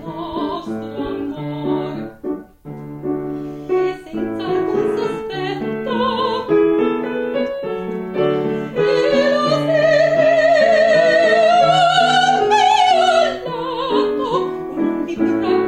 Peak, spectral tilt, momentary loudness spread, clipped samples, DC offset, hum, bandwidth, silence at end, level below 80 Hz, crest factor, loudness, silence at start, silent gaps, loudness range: -2 dBFS; -5 dB/octave; 13 LU; under 0.1%; under 0.1%; none; 10.5 kHz; 0 s; -50 dBFS; 14 dB; -17 LUFS; 0 s; none; 11 LU